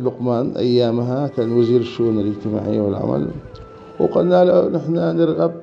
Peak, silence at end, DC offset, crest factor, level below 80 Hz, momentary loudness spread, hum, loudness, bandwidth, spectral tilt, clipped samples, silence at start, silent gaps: -2 dBFS; 0 s; under 0.1%; 16 dB; -50 dBFS; 9 LU; none; -18 LUFS; 6.8 kHz; -9 dB/octave; under 0.1%; 0 s; none